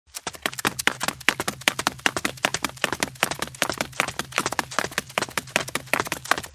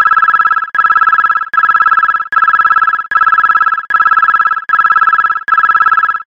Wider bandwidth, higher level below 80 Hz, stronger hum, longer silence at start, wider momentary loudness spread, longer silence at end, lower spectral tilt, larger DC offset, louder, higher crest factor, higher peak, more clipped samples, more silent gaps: first, 16 kHz vs 7 kHz; about the same, -52 dBFS vs -54 dBFS; neither; first, 0.15 s vs 0 s; about the same, 3 LU vs 3 LU; about the same, 0.05 s vs 0.1 s; about the same, -1.5 dB/octave vs -2 dB/octave; neither; second, -25 LUFS vs -9 LUFS; first, 28 dB vs 10 dB; about the same, 0 dBFS vs 0 dBFS; neither; neither